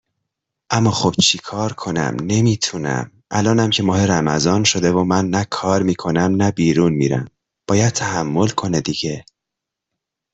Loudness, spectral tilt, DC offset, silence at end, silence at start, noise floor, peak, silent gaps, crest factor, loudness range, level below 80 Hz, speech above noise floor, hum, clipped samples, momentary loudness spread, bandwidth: -18 LUFS; -4.5 dB/octave; under 0.1%; 1.15 s; 0.7 s; -83 dBFS; -2 dBFS; none; 16 dB; 3 LU; -50 dBFS; 66 dB; none; under 0.1%; 8 LU; 8.4 kHz